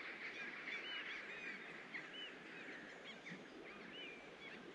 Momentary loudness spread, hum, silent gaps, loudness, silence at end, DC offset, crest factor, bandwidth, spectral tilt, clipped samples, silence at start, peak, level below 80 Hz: 8 LU; none; none; -50 LUFS; 0 s; under 0.1%; 16 dB; 10.5 kHz; -3 dB/octave; under 0.1%; 0 s; -36 dBFS; -86 dBFS